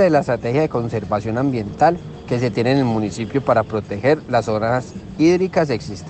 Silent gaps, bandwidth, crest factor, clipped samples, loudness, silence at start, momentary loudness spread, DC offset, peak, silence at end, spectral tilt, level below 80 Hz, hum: none; 8.8 kHz; 16 dB; under 0.1%; -19 LUFS; 0 s; 6 LU; under 0.1%; -2 dBFS; 0 s; -7 dB/octave; -46 dBFS; none